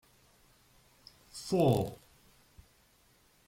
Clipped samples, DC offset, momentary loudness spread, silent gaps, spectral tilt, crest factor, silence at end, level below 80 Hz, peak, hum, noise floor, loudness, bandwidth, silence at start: under 0.1%; under 0.1%; 22 LU; none; -7 dB/octave; 22 dB; 1.5 s; -64 dBFS; -16 dBFS; none; -67 dBFS; -31 LUFS; 16.5 kHz; 1.35 s